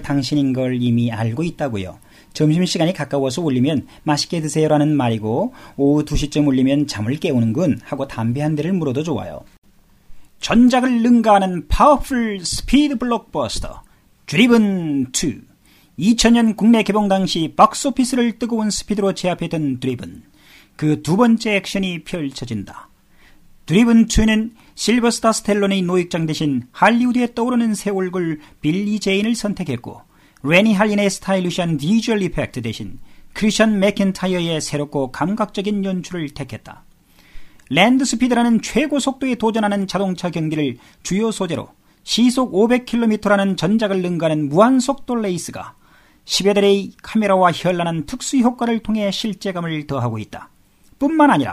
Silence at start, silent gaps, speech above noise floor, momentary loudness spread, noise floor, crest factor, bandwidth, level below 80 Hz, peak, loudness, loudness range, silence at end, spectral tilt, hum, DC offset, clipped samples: 0 s; 9.58-9.62 s; 31 dB; 11 LU; -49 dBFS; 18 dB; 14.5 kHz; -38 dBFS; 0 dBFS; -18 LUFS; 5 LU; 0 s; -5 dB/octave; none; under 0.1%; under 0.1%